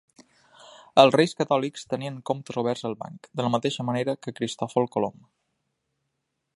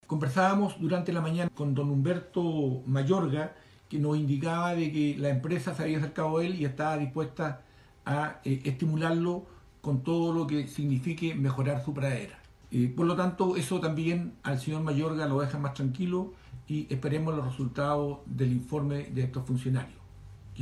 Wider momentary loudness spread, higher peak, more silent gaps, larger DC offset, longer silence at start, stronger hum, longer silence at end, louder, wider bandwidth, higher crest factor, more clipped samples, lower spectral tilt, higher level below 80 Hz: first, 13 LU vs 6 LU; first, -2 dBFS vs -14 dBFS; neither; neither; first, 0.95 s vs 0.1 s; neither; first, 1.45 s vs 0 s; first, -25 LUFS vs -30 LUFS; about the same, 11.5 kHz vs 12.5 kHz; first, 26 dB vs 16 dB; neither; second, -5.5 dB/octave vs -7.5 dB/octave; second, -70 dBFS vs -58 dBFS